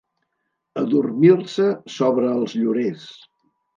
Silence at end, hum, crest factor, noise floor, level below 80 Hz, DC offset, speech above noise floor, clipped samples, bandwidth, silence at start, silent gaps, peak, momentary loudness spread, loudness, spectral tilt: 0.65 s; none; 18 dB; -76 dBFS; -72 dBFS; under 0.1%; 57 dB; under 0.1%; 7.4 kHz; 0.75 s; none; -2 dBFS; 11 LU; -20 LUFS; -7.5 dB/octave